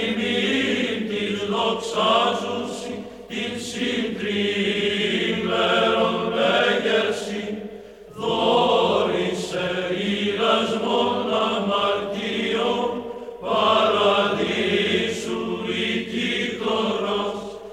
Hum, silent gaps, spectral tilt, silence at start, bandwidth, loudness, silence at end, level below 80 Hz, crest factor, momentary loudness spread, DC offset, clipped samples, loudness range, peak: none; none; -4.5 dB/octave; 0 s; 14 kHz; -22 LUFS; 0 s; -58 dBFS; 16 dB; 10 LU; under 0.1%; under 0.1%; 3 LU; -6 dBFS